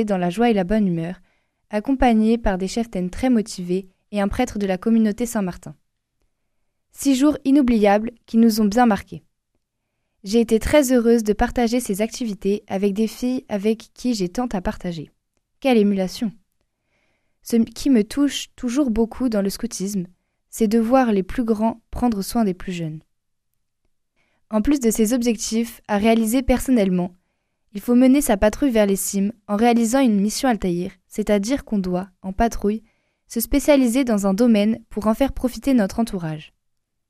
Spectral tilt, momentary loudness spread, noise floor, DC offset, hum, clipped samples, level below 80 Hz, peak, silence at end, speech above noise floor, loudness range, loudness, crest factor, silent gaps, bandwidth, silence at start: -5.5 dB/octave; 12 LU; -75 dBFS; under 0.1%; none; under 0.1%; -38 dBFS; -2 dBFS; 0.65 s; 55 dB; 5 LU; -20 LUFS; 18 dB; none; 15.5 kHz; 0 s